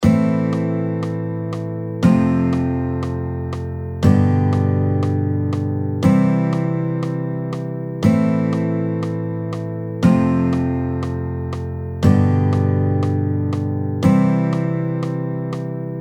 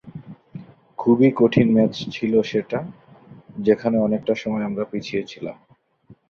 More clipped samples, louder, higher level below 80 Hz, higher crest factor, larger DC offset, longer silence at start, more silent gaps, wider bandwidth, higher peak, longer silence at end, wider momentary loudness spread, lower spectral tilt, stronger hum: neither; about the same, -19 LUFS vs -20 LUFS; first, -42 dBFS vs -58 dBFS; about the same, 18 dB vs 18 dB; neither; about the same, 0 s vs 0.05 s; neither; first, 10 kHz vs 6.8 kHz; about the same, 0 dBFS vs -2 dBFS; second, 0 s vs 0.15 s; second, 10 LU vs 23 LU; first, -9 dB/octave vs -7.5 dB/octave; neither